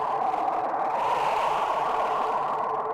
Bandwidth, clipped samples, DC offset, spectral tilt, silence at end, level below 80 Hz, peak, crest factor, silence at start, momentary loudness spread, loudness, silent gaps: 15.5 kHz; under 0.1%; under 0.1%; -4 dB/octave; 0 s; -62 dBFS; -14 dBFS; 12 dB; 0 s; 2 LU; -26 LUFS; none